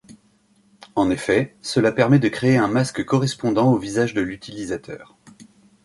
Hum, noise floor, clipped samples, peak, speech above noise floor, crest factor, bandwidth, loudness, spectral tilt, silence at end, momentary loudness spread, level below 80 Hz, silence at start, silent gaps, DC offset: none; -59 dBFS; under 0.1%; -4 dBFS; 40 dB; 18 dB; 11.5 kHz; -20 LUFS; -6.5 dB/octave; 0.4 s; 12 LU; -54 dBFS; 0.1 s; none; under 0.1%